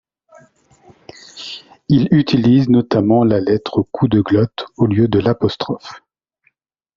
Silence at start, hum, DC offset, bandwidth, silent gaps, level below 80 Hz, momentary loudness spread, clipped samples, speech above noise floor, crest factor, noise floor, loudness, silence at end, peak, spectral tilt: 1.35 s; none; under 0.1%; 7.4 kHz; none; -48 dBFS; 17 LU; under 0.1%; 49 dB; 16 dB; -63 dBFS; -15 LUFS; 1 s; 0 dBFS; -7 dB/octave